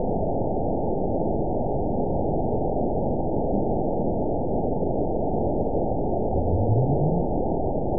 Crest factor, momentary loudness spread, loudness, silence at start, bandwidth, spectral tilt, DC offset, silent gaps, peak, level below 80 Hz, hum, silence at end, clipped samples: 14 dB; 3 LU; -25 LUFS; 0 s; 1 kHz; -19 dB/octave; 3%; none; -10 dBFS; -34 dBFS; none; 0 s; under 0.1%